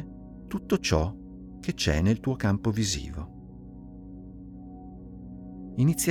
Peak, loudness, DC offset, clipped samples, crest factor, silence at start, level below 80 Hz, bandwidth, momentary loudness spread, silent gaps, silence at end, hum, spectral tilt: -10 dBFS; -28 LUFS; under 0.1%; under 0.1%; 20 dB; 0 s; -44 dBFS; 18 kHz; 20 LU; none; 0 s; none; -5 dB/octave